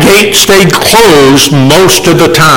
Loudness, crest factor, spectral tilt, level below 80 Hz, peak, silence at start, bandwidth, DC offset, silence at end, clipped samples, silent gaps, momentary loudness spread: -3 LUFS; 4 dB; -3.5 dB/octave; -30 dBFS; 0 dBFS; 0 s; over 20 kHz; under 0.1%; 0 s; 3%; none; 2 LU